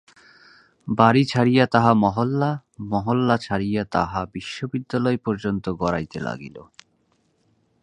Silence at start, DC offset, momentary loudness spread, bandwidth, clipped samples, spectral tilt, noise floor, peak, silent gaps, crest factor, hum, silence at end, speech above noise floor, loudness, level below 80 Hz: 0.85 s; under 0.1%; 14 LU; 10 kHz; under 0.1%; -7 dB/octave; -66 dBFS; 0 dBFS; none; 22 dB; none; 1.2 s; 45 dB; -22 LUFS; -50 dBFS